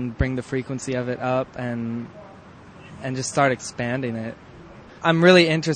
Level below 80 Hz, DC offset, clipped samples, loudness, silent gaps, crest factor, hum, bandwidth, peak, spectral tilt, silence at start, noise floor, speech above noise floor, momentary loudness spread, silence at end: -44 dBFS; under 0.1%; under 0.1%; -22 LUFS; none; 22 dB; none; 9.4 kHz; 0 dBFS; -5 dB/octave; 0 s; -44 dBFS; 23 dB; 19 LU; 0 s